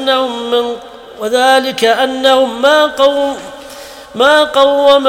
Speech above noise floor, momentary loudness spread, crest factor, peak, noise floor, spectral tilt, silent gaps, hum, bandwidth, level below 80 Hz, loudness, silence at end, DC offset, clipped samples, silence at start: 21 dB; 18 LU; 12 dB; 0 dBFS; -31 dBFS; -2 dB/octave; none; none; 16.5 kHz; -52 dBFS; -11 LUFS; 0 s; under 0.1%; 0.2%; 0 s